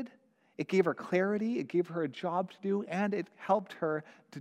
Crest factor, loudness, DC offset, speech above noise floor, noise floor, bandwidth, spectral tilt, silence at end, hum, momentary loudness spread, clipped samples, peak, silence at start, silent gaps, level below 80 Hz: 18 dB; -33 LUFS; under 0.1%; 31 dB; -64 dBFS; 9.8 kHz; -7.5 dB/octave; 0 s; none; 8 LU; under 0.1%; -14 dBFS; 0 s; none; -82 dBFS